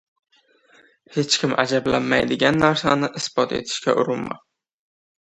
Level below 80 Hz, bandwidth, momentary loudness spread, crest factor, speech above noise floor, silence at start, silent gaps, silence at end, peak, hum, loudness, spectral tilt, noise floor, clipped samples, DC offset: -54 dBFS; 11 kHz; 10 LU; 22 dB; 36 dB; 1.1 s; none; 0.9 s; 0 dBFS; none; -20 LUFS; -4 dB/octave; -56 dBFS; under 0.1%; under 0.1%